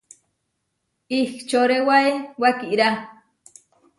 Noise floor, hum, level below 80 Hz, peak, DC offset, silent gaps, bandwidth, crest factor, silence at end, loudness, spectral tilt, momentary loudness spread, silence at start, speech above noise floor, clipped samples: -75 dBFS; none; -70 dBFS; -4 dBFS; under 0.1%; none; 11.5 kHz; 20 dB; 0.85 s; -20 LUFS; -4 dB/octave; 7 LU; 1.1 s; 55 dB; under 0.1%